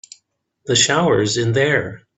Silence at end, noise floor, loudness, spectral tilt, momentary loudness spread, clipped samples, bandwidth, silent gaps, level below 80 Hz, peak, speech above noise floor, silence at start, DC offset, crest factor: 0.2 s; -64 dBFS; -16 LUFS; -3.5 dB/octave; 6 LU; under 0.1%; 8.4 kHz; none; -52 dBFS; -2 dBFS; 47 dB; 0.65 s; under 0.1%; 18 dB